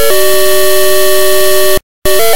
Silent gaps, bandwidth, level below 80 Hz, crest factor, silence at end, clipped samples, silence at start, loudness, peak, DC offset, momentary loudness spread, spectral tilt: 1.83-2.02 s; over 20 kHz; -30 dBFS; 6 dB; 0 s; 1%; 0 s; -9 LUFS; 0 dBFS; 40%; 4 LU; -2 dB/octave